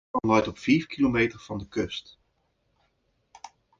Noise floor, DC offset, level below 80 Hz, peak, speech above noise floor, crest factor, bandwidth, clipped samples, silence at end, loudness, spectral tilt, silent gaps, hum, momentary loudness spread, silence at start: -72 dBFS; under 0.1%; -54 dBFS; -10 dBFS; 47 dB; 20 dB; 7.6 kHz; under 0.1%; 0.35 s; -26 LUFS; -6 dB/octave; none; none; 10 LU; 0.15 s